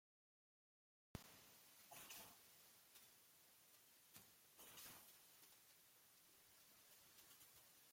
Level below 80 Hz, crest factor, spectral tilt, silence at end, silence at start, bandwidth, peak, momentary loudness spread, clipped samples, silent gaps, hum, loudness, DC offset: -84 dBFS; 30 dB; -2 dB/octave; 0 s; 1.15 s; 16.5 kHz; -36 dBFS; 10 LU; under 0.1%; none; none; -64 LUFS; under 0.1%